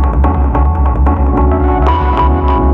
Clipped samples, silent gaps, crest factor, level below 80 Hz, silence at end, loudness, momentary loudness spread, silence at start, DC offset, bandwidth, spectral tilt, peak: under 0.1%; none; 10 dB; -12 dBFS; 0 s; -12 LUFS; 1 LU; 0 s; under 0.1%; 3.9 kHz; -10 dB/octave; 0 dBFS